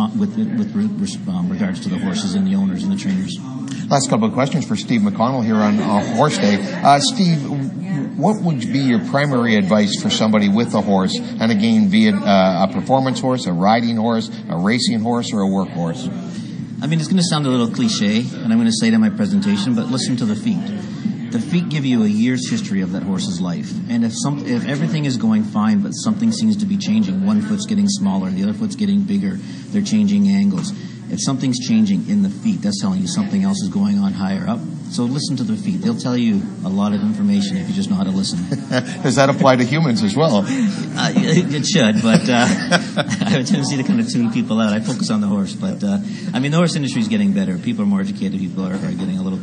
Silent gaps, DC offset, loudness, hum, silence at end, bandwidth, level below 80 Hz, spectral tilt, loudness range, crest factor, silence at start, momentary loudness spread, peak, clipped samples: none; under 0.1%; -18 LUFS; none; 0 s; 10.5 kHz; -60 dBFS; -5.5 dB/octave; 4 LU; 18 dB; 0 s; 8 LU; 0 dBFS; under 0.1%